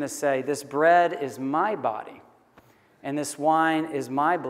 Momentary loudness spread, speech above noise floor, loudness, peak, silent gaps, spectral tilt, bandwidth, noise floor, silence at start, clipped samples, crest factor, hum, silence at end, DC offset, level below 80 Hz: 12 LU; 33 dB; -24 LUFS; -8 dBFS; none; -4.5 dB/octave; 16 kHz; -57 dBFS; 0 s; under 0.1%; 18 dB; none; 0 s; under 0.1%; -78 dBFS